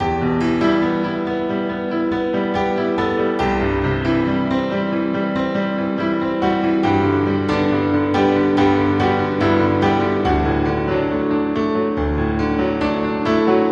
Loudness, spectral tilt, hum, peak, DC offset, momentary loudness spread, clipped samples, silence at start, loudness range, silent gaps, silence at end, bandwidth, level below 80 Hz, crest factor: -18 LUFS; -7.5 dB/octave; none; -4 dBFS; under 0.1%; 5 LU; under 0.1%; 0 s; 3 LU; none; 0 s; 7.8 kHz; -36 dBFS; 14 dB